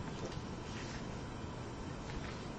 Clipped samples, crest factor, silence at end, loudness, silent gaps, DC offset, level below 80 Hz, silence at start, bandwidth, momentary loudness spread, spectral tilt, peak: under 0.1%; 14 dB; 0 s; -45 LUFS; none; under 0.1%; -52 dBFS; 0 s; 9.2 kHz; 2 LU; -5.5 dB/octave; -30 dBFS